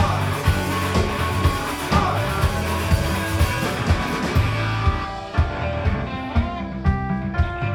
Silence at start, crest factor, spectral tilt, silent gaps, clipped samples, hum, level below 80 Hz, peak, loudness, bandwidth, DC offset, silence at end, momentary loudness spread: 0 s; 16 dB; -5.5 dB/octave; none; under 0.1%; none; -28 dBFS; -4 dBFS; -22 LUFS; 19 kHz; under 0.1%; 0 s; 3 LU